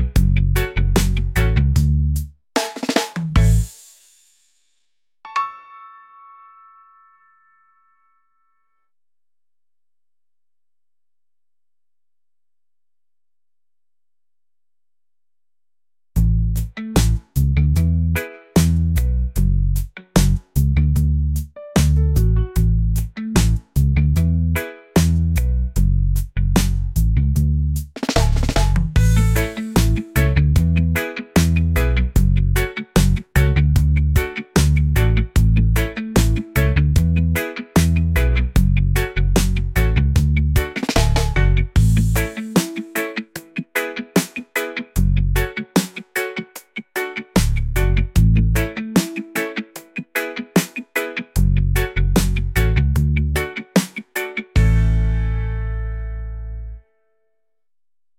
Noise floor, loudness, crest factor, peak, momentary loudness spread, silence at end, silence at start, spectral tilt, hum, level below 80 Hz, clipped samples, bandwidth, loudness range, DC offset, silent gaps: under -90 dBFS; -19 LUFS; 18 dB; 0 dBFS; 8 LU; 1.4 s; 0 s; -6 dB/octave; none; -22 dBFS; under 0.1%; 17 kHz; 5 LU; under 0.1%; none